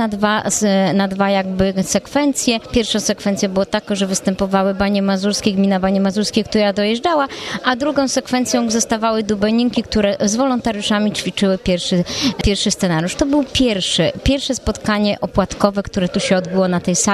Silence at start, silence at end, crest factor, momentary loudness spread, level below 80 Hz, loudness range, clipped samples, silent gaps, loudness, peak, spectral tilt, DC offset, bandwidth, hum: 0 s; 0 s; 16 dB; 3 LU; -36 dBFS; 1 LU; under 0.1%; none; -17 LUFS; 0 dBFS; -4 dB/octave; under 0.1%; 14 kHz; none